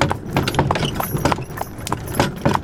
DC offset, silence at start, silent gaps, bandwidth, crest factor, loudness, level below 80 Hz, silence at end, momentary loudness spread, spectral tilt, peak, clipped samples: under 0.1%; 0 s; none; 18 kHz; 20 dB; -21 LUFS; -36 dBFS; 0 s; 7 LU; -5 dB/octave; 0 dBFS; under 0.1%